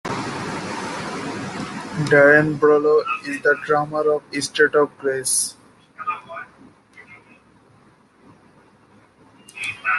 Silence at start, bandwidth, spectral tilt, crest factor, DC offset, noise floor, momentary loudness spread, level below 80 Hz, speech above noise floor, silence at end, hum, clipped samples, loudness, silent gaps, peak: 0.05 s; 12.5 kHz; -4 dB/octave; 20 dB; under 0.1%; -54 dBFS; 15 LU; -60 dBFS; 36 dB; 0 s; none; under 0.1%; -20 LUFS; none; -2 dBFS